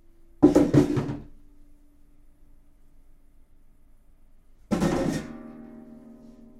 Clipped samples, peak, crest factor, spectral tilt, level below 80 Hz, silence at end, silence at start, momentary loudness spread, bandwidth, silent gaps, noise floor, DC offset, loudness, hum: under 0.1%; -4 dBFS; 24 dB; -7.5 dB/octave; -46 dBFS; 0.8 s; 0.4 s; 26 LU; 13.5 kHz; none; -53 dBFS; under 0.1%; -23 LUFS; none